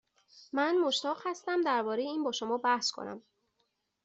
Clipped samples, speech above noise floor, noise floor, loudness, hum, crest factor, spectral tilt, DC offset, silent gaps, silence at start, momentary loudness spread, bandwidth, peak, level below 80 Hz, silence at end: under 0.1%; 48 dB; -79 dBFS; -31 LUFS; none; 18 dB; -2.5 dB/octave; under 0.1%; none; 0.35 s; 9 LU; 8 kHz; -16 dBFS; -82 dBFS; 0.85 s